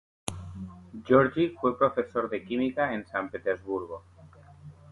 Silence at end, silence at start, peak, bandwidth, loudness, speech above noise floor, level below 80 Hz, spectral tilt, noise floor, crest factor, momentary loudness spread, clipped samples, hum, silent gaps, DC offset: 0.2 s; 0.25 s; -8 dBFS; 11.5 kHz; -28 LUFS; 25 dB; -56 dBFS; -6 dB/octave; -52 dBFS; 22 dB; 19 LU; under 0.1%; none; none; under 0.1%